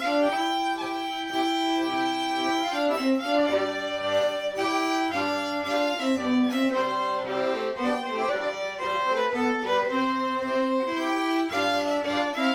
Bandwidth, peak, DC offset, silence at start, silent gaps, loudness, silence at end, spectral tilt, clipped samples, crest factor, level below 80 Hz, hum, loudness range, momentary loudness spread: 19 kHz; -12 dBFS; under 0.1%; 0 s; none; -26 LUFS; 0 s; -3.5 dB/octave; under 0.1%; 14 dB; -66 dBFS; none; 1 LU; 4 LU